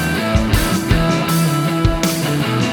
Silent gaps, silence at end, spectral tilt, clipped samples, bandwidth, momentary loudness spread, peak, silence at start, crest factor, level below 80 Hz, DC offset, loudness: none; 0 s; -5 dB/octave; under 0.1%; over 20 kHz; 2 LU; 0 dBFS; 0 s; 14 dB; -26 dBFS; under 0.1%; -16 LUFS